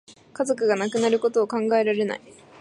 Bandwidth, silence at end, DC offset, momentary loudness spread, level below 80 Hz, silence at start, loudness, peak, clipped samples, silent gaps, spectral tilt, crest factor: 11.5 kHz; 0.45 s; under 0.1%; 7 LU; -74 dBFS; 0.1 s; -23 LUFS; -8 dBFS; under 0.1%; none; -4.5 dB/octave; 16 dB